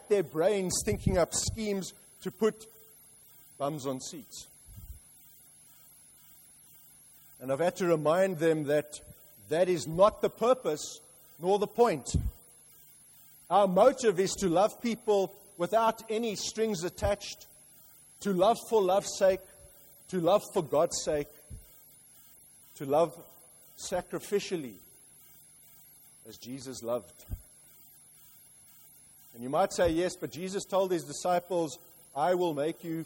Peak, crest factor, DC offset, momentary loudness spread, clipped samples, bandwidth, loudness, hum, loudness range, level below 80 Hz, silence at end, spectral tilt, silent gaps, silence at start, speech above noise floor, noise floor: -10 dBFS; 20 dB; under 0.1%; 19 LU; under 0.1%; 16.5 kHz; -30 LUFS; none; 13 LU; -52 dBFS; 0 s; -4.5 dB/octave; none; 0.1 s; 28 dB; -57 dBFS